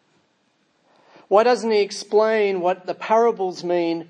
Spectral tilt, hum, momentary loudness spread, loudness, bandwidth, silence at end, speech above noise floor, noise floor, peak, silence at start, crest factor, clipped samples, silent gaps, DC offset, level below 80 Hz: -4.5 dB/octave; none; 6 LU; -20 LUFS; 10 kHz; 0.05 s; 46 dB; -65 dBFS; -2 dBFS; 1.3 s; 18 dB; under 0.1%; none; under 0.1%; -82 dBFS